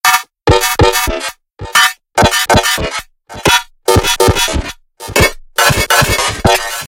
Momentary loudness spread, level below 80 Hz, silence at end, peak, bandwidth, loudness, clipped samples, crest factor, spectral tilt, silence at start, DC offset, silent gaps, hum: 11 LU; -26 dBFS; 0 s; 0 dBFS; over 20 kHz; -11 LUFS; 0.2%; 12 dB; -3 dB/octave; 0.05 s; under 0.1%; none; none